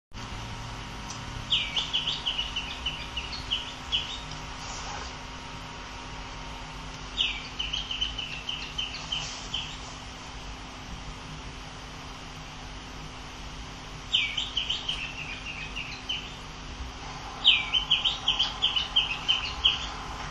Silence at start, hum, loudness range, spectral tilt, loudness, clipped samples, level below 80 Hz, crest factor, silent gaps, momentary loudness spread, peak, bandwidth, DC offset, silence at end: 0.1 s; none; 13 LU; -2 dB/octave; -29 LUFS; under 0.1%; -44 dBFS; 26 dB; none; 17 LU; -6 dBFS; 12.5 kHz; under 0.1%; 0 s